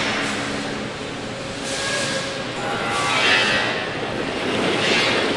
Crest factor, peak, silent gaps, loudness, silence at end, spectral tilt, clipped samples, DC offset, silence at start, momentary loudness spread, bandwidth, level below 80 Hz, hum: 18 dB; -4 dBFS; none; -21 LUFS; 0 s; -3 dB/octave; under 0.1%; under 0.1%; 0 s; 12 LU; 11.5 kHz; -50 dBFS; none